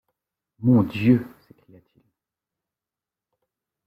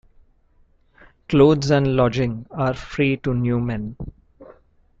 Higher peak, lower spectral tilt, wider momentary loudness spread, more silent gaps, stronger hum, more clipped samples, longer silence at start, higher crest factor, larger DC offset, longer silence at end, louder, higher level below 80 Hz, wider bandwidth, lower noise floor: second, -6 dBFS vs -2 dBFS; first, -9.5 dB/octave vs -7.5 dB/octave; second, 9 LU vs 14 LU; neither; neither; neither; second, 0.6 s vs 1.3 s; about the same, 20 dB vs 18 dB; neither; first, 2.6 s vs 0.5 s; about the same, -21 LUFS vs -20 LUFS; second, -60 dBFS vs -44 dBFS; second, 5.2 kHz vs 7.6 kHz; first, -90 dBFS vs -57 dBFS